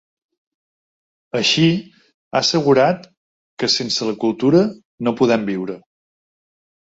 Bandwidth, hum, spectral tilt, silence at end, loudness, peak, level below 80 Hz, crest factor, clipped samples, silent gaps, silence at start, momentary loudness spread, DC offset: 8 kHz; none; -4.5 dB/octave; 1.05 s; -18 LUFS; -2 dBFS; -60 dBFS; 18 dB; under 0.1%; 2.14-2.31 s, 3.17-3.57 s, 4.85-4.98 s; 1.35 s; 11 LU; under 0.1%